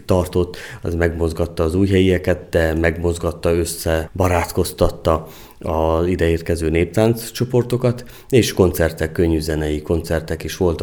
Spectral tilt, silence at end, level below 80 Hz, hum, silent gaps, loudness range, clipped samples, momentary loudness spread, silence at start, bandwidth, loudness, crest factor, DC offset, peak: -6 dB/octave; 0 s; -32 dBFS; none; none; 1 LU; under 0.1%; 6 LU; 0.1 s; 19.5 kHz; -19 LUFS; 18 dB; under 0.1%; 0 dBFS